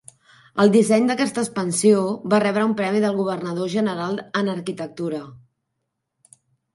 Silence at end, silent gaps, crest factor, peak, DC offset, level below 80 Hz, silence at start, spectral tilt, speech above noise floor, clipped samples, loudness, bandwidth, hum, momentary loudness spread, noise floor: 1.4 s; none; 18 dB; -4 dBFS; under 0.1%; -68 dBFS; 0.55 s; -5.5 dB/octave; 58 dB; under 0.1%; -21 LUFS; 11.5 kHz; none; 12 LU; -78 dBFS